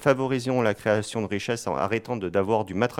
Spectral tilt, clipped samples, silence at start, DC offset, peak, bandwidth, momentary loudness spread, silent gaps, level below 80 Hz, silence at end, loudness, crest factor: -5.5 dB/octave; under 0.1%; 0 s; under 0.1%; -6 dBFS; 16 kHz; 5 LU; none; -60 dBFS; 0 s; -26 LUFS; 18 dB